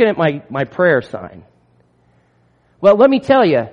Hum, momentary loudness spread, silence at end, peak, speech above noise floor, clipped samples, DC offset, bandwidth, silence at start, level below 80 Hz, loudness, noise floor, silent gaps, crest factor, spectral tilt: 60 Hz at -50 dBFS; 19 LU; 0.05 s; 0 dBFS; 43 dB; under 0.1%; under 0.1%; 7 kHz; 0 s; -56 dBFS; -14 LUFS; -56 dBFS; none; 14 dB; -8 dB/octave